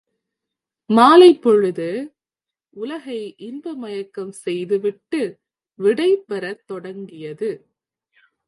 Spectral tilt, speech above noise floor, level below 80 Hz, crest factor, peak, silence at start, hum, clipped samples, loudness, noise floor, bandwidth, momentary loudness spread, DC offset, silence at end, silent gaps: -5.5 dB/octave; 71 dB; -74 dBFS; 20 dB; 0 dBFS; 0.9 s; none; under 0.1%; -17 LUFS; -89 dBFS; 11.5 kHz; 21 LU; under 0.1%; 0.9 s; none